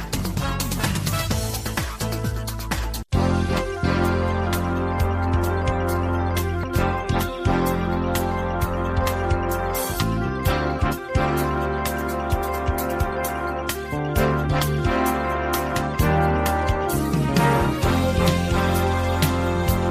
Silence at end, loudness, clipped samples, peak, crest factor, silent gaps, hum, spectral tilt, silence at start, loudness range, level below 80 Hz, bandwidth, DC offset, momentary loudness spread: 0 s; -23 LUFS; under 0.1%; -4 dBFS; 18 dB; none; none; -5.5 dB/octave; 0 s; 3 LU; -30 dBFS; 15.5 kHz; under 0.1%; 5 LU